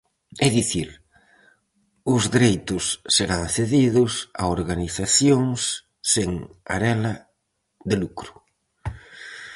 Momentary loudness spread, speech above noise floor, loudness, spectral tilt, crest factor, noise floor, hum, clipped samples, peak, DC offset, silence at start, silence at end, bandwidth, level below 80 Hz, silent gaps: 18 LU; 52 dB; -22 LUFS; -4 dB/octave; 20 dB; -74 dBFS; none; under 0.1%; -4 dBFS; under 0.1%; 0.35 s; 0 s; 11.5 kHz; -44 dBFS; none